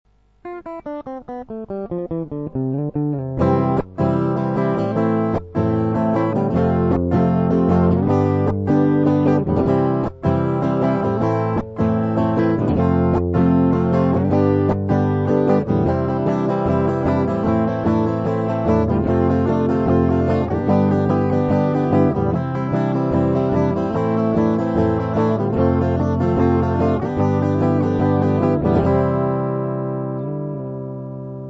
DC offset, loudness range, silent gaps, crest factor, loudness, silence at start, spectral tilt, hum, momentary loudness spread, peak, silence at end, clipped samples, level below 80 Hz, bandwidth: under 0.1%; 3 LU; none; 14 dB; -19 LUFS; 0.45 s; -10.5 dB/octave; none; 8 LU; -4 dBFS; 0 s; under 0.1%; -40 dBFS; 7.6 kHz